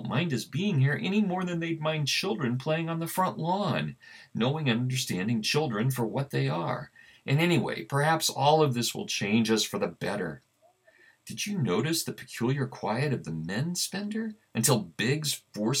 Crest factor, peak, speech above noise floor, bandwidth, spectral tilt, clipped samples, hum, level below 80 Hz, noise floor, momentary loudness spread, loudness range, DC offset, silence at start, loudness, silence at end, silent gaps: 18 dB; -10 dBFS; 35 dB; 17.5 kHz; -4.5 dB/octave; under 0.1%; none; -70 dBFS; -63 dBFS; 9 LU; 5 LU; under 0.1%; 0 s; -28 LUFS; 0 s; none